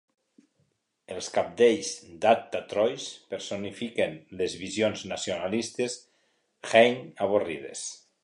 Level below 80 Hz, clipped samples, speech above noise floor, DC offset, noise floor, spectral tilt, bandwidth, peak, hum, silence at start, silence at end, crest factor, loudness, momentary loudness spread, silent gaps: -66 dBFS; under 0.1%; 46 dB; under 0.1%; -73 dBFS; -3.5 dB/octave; 11 kHz; -6 dBFS; none; 1.1 s; 0.25 s; 22 dB; -28 LUFS; 14 LU; none